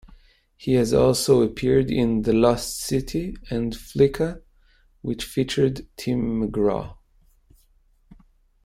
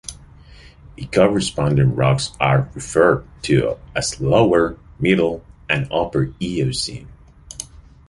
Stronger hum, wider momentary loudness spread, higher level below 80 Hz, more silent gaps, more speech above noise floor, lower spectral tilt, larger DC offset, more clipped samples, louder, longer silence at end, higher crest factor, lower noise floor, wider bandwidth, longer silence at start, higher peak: neither; second, 12 LU vs 17 LU; about the same, -42 dBFS vs -40 dBFS; neither; first, 38 dB vs 26 dB; about the same, -6 dB/octave vs -5.5 dB/octave; neither; neither; second, -22 LUFS vs -19 LUFS; first, 0.5 s vs 0.3 s; about the same, 18 dB vs 18 dB; first, -60 dBFS vs -44 dBFS; first, 16 kHz vs 11.5 kHz; first, 0.6 s vs 0.1 s; second, -4 dBFS vs 0 dBFS